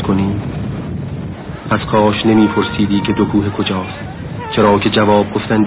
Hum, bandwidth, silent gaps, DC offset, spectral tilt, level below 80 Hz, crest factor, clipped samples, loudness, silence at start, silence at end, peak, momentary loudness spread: none; 4 kHz; none; under 0.1%; -11 dB/octave; -34 dBFS; 14 dB; under 0.1%; -15 LUFS; 0 s; 0 s; 0 dBFS; 14 LU